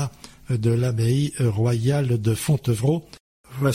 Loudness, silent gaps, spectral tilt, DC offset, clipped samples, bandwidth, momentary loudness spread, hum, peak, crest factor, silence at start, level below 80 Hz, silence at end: -22 LUFS; 3.20-3.44 s; -7 dB/octave; under 0.1%; under 0.1%; 15.5 kHz; 7 LU; none; -8 dBFS; 14 dB; 0 s; -50 dBFS; 0 s